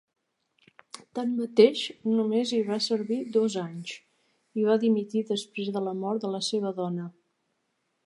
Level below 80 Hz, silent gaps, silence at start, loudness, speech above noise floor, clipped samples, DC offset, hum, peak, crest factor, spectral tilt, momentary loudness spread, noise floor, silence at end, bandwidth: -82 dBFS; none; 1.15 s; -27 LUFS; 50 dB; under 0.1%; under 0.1%; none; -6 dBFS; 22 dB; -5.5 dB/octave; 16 LU; -77 dBFS; 0.95 s; 11.5 kHz